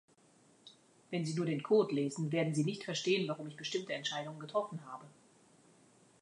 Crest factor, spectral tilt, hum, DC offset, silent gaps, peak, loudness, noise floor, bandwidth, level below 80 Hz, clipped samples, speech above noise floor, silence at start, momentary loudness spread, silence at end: 18 dB; -5.5 dB/octave; none; under 0.1%; none; -18 dBFS; -36 LUFS; -67 dBFS; 11 kHz; -84 dBFS; under 0.1%; 31 dB; 0.65 s; 11 LU; 1.15 s